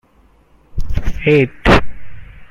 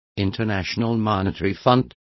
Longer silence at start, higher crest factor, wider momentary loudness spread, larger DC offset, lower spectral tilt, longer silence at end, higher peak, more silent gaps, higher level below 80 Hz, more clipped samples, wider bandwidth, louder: first, 0.75 s vs 0.15 s; about the same, 16 dB vs 20 dB; first, 17 LU vs 5 LU; neither; about the same, -6.5 dB/octave vs -7 dB/octave; second, 0.05 s vs 0.3 s; about the same, 0 dBFS vs -2 dBFS; neither; first, -24 dBFS vs -42 dBFS; neither; first, 10 kHz vs 6.2 kHz; first, -15 LUFS vs -22 LUFS